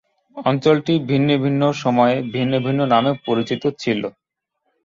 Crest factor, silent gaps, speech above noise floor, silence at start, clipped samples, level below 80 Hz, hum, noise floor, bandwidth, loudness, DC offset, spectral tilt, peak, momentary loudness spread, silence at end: 18 dB; none; 56 dB; 0.35 s; under 0.1%; -60 dBFS; none; -74 dBFS; 7.6 kHz; -19 LUFS; under 0.1%; -7 dB/octave; -2 dBFS; 6 LU; 0.75 s